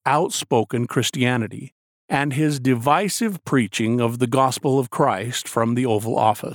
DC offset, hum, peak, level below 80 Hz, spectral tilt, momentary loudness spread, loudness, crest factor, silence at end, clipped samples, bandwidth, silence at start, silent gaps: under 0.1%; none; -4 dBFS; -64 dBFS; -5 dB/octave; 5 LU; -21 LUFS; 16 dB; 0 s; under 0.1%; 19.5 kHz; 0.05 s; 1.72-2.08 s